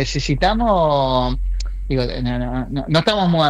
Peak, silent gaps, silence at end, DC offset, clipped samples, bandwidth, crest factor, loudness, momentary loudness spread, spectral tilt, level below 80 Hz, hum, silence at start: -4 dBFS; none; 0 s; under 0.1%; under 0.1%; 10 kHz; 14 dB; -19 LUFS; 8 LU; -6 dB/octave; -26 dBFS; none; 0 s